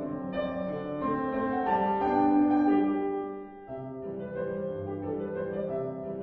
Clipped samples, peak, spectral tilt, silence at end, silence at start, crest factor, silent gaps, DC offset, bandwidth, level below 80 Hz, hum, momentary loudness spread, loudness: under 0.1%; -14 dBFS; -10 dB/octave; 0 s; 0 s; 14 dB; none; under 0.1%; 4.3 kHz; -60 dBFS; none; 14 LU; -30 LUFS